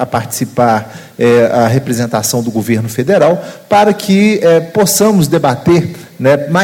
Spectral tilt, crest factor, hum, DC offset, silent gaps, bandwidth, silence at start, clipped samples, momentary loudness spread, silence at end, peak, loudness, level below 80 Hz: -5 dB/octave; 10 dB; none; under 0.1%; none; 17.5 kHz; 0 s; under 0.1%; 7 LU; 0 s; 0 dBFS; -11 LUFS; -48 dBFS